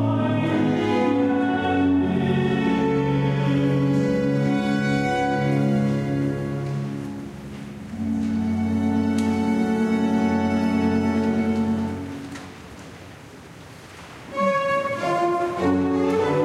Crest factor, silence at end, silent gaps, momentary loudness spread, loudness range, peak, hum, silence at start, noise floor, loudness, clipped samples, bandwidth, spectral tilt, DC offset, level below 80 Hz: 12 dB; 0 s; none; 16 LU; 6 LU; -10 dBFS; none; 0 s; -42 dBFS; -22 LUFS; under 0.1%; 12 kHz; -7.5 dB/octave; under 0.1%; -50 dBFS